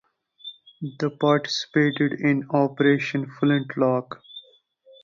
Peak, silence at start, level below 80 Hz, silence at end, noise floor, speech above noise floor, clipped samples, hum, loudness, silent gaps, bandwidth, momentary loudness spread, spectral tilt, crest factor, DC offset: -6 dBFS; 0.45 s; -68 dBFS; 0.65 s; -56 dBFS; 34 dB; under 0.1%; none; -23 LUFS; none; 7.4 kHz; 19 LU; -6.5 dB/octave; 18 dB; under 0.1%